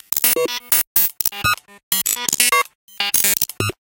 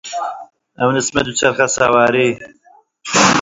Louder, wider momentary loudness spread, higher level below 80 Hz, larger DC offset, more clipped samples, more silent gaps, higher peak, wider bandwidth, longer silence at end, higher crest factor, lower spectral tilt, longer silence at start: about the same, -16 LUFS vs -15 LUFS; second, 7 LU vs 15 LU; about the same, -50 dBFS vs -50 dBFS; neither; neither; first, 0.87-0.95 s, 1.83-1.91 s, 2.75-2.88 s vs none; about the same, 0 dBFS vs 0 dBFS; first, over 20 kHz vs 8 kHz; first, 0.15 s vs 0 s; about the same, 20 dB vs 16 dB; second, -0.5 dB/octave vs -3 dB/octave; about the same, 0.1 s vs 0.05 s